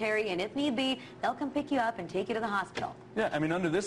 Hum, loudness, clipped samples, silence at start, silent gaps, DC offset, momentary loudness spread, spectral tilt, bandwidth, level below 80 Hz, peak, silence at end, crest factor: none; -32 LUFS; under 0.1%; 0 s; none; under 0.1%; 5 LU; -5 dB/octave; 12 kHz; -64 dBFS; -18 dBFS; 0 s; 14 dB